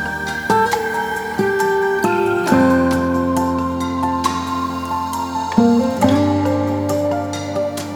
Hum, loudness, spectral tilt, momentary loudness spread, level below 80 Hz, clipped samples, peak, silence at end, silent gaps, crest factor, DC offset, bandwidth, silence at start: none; -18 LUFS; -5.5 dB/octave; 8 LU; -44 dBFS; under 0.1%; 0 dBFS; 0 s; none; 16 dB; under 0.1%; over 20 kHz; 0 s